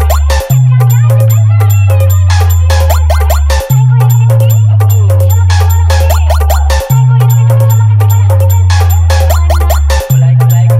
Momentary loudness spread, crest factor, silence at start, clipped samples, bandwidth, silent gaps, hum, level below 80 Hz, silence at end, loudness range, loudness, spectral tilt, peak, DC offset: 3 LU; 6 dB; 0 s; under 0.1%; 16 kHz; none; none; -14 dBFS; 0 s; 0 LU; -7 LUFS; -6 dB/octave; 0 dBFS; under 0.1%